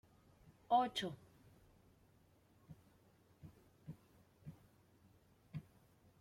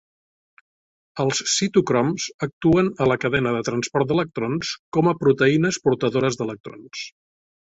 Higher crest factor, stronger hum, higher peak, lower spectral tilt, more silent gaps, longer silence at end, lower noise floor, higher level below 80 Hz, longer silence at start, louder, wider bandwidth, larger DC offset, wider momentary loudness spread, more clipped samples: first, 24 dB vs 18 dB; neither; second, -22 dBFS vs -4 dBFS; about the same, -5 dB/octave vs -5 dB/octave; second, none vs 2.34-2.39 s, 2.53-2.61 s, 4.79-4.92 s, 6.60-6.64 s; about the same, 0.6 s vs 0.55 s; second, -71 dBFS vs under -90 dBFS; second, -76 dBFS vs -54 dBFS; second, 0.7 s vs 1.15 s; second, -40 LUFS vs -21 LUFS; first, 16.5 kHz vs 8.4 kHz; neither; first, 27 LU vs 14 LU; neither